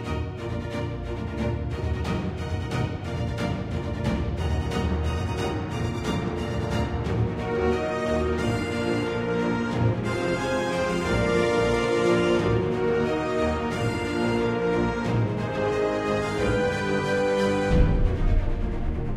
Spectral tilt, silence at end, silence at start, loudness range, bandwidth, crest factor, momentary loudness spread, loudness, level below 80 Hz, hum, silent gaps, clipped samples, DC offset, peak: -6.5 dB/octave; 0 s; 0 s; 5 LU; 13.5 kHz; 18 dB; 7 LU; -26 LUFS; -32 dBFS; none; none; under 0.1%; under 0.1%; -6 dBFS